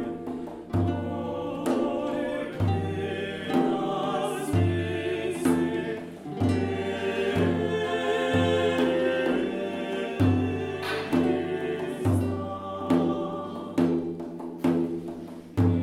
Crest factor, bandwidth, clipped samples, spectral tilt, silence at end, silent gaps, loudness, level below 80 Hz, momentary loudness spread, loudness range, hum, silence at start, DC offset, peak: 16 dB; 14.5 kHz; under 0.1%; -7 dB/octave; 0 s; none; -27 LUFS; -58 dBFS; 9 LU; 3 LU; none; 0 s; under 0.1%; -10 dBFS